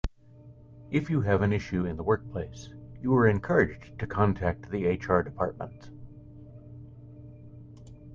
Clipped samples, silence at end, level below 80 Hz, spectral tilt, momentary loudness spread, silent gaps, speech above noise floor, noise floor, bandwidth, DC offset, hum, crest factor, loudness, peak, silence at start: under 0.1%; 0 s; -48 dBFS; -8.5 dB/octave; 24 LU; none; 25 dB; -52 dBFS; 7.4 kHz; under 0.1%; none; 22 dB; -28 LUFS; -8 dBFS; 0.05 s